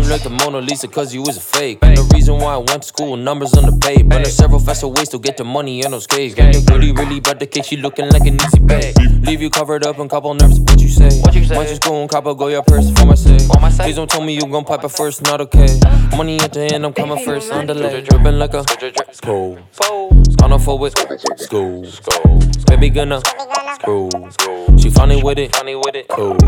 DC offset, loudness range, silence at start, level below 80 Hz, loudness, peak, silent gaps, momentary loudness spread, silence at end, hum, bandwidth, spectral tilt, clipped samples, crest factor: under 0.1%; 3 LU; 0 s; -12 dBFS; -13 LUFS; 0 dBFS; none; 10 LU; 0 s; none; 16.5 kHz; -5.5 dB/octave; 0.3%; 10 dB